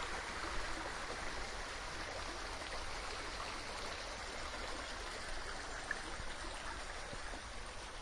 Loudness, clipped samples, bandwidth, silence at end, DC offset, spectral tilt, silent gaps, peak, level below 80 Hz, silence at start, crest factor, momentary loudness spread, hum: -44 LUFS; under 0.1%; 11.5 kHz; 0 s; under 0.1%; -2.5 dB/octave; none; -26 dBFS; -50 dBFS; 0 s; 18 dB; 4 LU; none